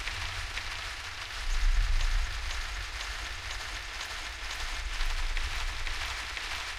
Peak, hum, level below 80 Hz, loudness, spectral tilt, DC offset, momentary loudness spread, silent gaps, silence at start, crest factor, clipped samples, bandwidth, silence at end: -14 dBFS; none; -34 dBFS; -35 LUFS; -1.5 dB/octave; under 0.1%; 4 LU; none; 0 s; 18 dB; under 0.1%; 14 kHz; 0 s